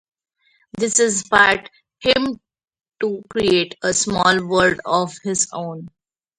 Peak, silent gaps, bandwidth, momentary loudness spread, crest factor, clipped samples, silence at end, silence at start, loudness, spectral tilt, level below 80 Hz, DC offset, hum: 0 dBFS; none; 11.5 kHz; 12 LU; 20 dB; under 0.1%; 0.5 s; 0.75 s; -18 LUFS; -2.5 dB/octave; -52 dBFS; under 0.1%; none